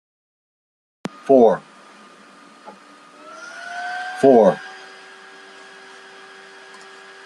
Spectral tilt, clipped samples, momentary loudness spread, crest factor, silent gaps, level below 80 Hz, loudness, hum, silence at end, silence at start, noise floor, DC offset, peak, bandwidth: -6 dB/octave; under 0.1%; 27 LU; 20 dB; none; -68 dBFS; -17 LUFS; none; 2.5 s; 1.25 s; -46 dBFS; under 0.1%; -2 dBFS; 11.5 kHz